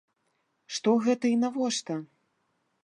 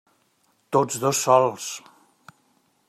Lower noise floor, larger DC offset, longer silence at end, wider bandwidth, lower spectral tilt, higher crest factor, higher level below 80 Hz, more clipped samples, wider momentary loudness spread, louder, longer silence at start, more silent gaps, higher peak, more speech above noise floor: first, -75 dBFS vs -66 dBFS; neither; second, 0.8 s vs 1.1 s; second, 11 kHz vs 15 kHz; about the same, -4 dB/octave vs -4 dB/octave; about the same, 18 dB vs 22 dB; second, -82 dBFS vs -72 dBFS; neither; second, 12 LU vs 15 LU; second, -28 LUFS vs -22 LUFS; about the same, 0.7 s vs 0.7 s; neither; second, -12 dBFS vs -4 dBFS; first, 49 dB vs 45 dB